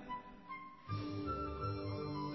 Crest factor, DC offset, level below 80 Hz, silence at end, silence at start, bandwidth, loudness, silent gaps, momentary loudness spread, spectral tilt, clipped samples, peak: 14 dB; under 0.1%; -56 dBFS; 0 s; 0 s; 6 kHz; -43 LUFS; none; 9 LU; -6 dB/octave; under 0.1%; -28 dBFS